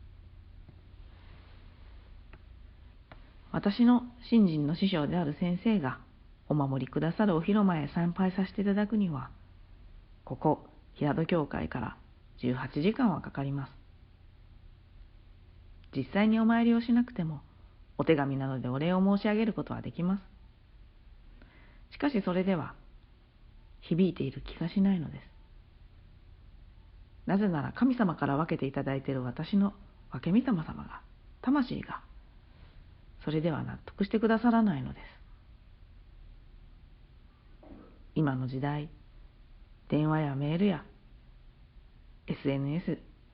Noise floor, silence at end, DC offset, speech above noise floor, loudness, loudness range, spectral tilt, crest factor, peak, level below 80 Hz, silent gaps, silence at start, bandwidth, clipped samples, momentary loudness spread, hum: -57 dBFS; 0.25 s; under 0.1%; 28 dB; -30 LUFS; 7 LU; -7 dB/octave; 20 dB; -12 dBFS; -54 dBFS; none; 0 s; 5.4 kHz; under 0.1%; 14 LU; none